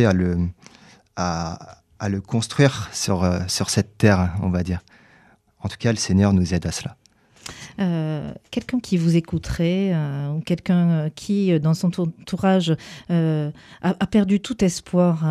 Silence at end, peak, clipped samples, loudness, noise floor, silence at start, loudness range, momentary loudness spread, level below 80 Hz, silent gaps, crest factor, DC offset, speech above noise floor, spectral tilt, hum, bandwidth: 0 s; -2 dBFS; under 0.1%; -22 LUFS; -55 dBFS; 0 s; 3 LU; 12 LU; -44 dBFS; none; 20 dB; under 0.1%; 34 dB; -6 dB/octave; none; 13 kHz